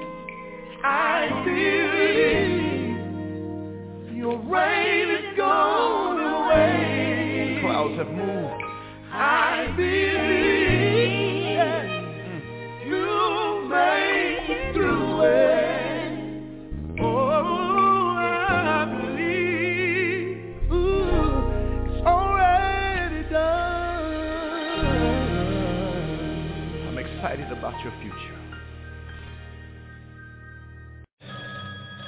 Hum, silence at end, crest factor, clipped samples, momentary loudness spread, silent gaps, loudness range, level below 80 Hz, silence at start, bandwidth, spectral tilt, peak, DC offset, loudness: none; 0 s; 16 dB; under 0.1%; 18 LU; 31.13-31.17 s; 11 LU; -36 dBFS; 0 s; 4 kHz; -9.5 dB/octave; -6 dBFS; under 0.1%; -23 LUFS